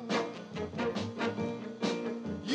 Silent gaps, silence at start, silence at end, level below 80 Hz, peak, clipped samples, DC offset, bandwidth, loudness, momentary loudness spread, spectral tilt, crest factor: none; 0 s; 0 s; -70 dBFS; -18 dBFS; under 0.1%; under 0.1%; 10 kHz; -36 LUFS; 5 LU; -5.5 dB/octave; 16 dB